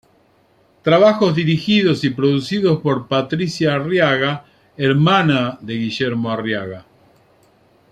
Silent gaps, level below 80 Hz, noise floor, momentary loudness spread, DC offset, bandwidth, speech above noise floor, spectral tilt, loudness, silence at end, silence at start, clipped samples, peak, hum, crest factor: none; -56 dBFS; -56 dBFS; 10 LU; under 0.1%; 10.5 kHz; 39 dB; -6.5 dB/octave; -17 LUFS; 1.1 s; 0.85 s; under 0.1%; -2 dBFS; none; 16 dB